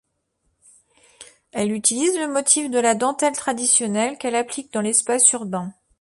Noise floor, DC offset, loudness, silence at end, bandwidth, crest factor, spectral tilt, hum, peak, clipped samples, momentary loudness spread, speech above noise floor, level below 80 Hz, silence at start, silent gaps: -71 dBFS; under 0.1%; -19 LUFS; 0.3 s; 12 kHz; 20 dB; -2.5 dB/octave; none; -2 dBFS; under 0.1%; 11 LU; 50 dB; -66 dBFS; 1.2 s; none